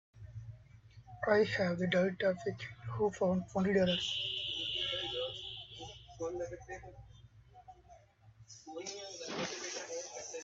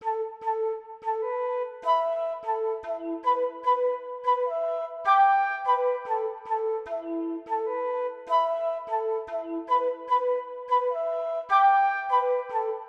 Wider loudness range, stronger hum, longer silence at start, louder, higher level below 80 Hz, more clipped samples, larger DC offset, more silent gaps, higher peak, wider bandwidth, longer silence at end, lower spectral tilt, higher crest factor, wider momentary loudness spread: first, 14 LU vs 4 LU; neither; first, 0.15 s vs 0 s; second, -35 LUFS vs -27 LUFS; first, -64 dBFS vs -74 dBFS; neither; neither; neither; second, -16 dBFS vs -10 dBFS; first, 7.8 kHz vs 7 kHz; about the same, 0 s vs 0 s; about the same, -4.5 dB/octave vs -4 dB/octave; first, 22 dB vs 16 dB; first, 20 LU vs 10 LU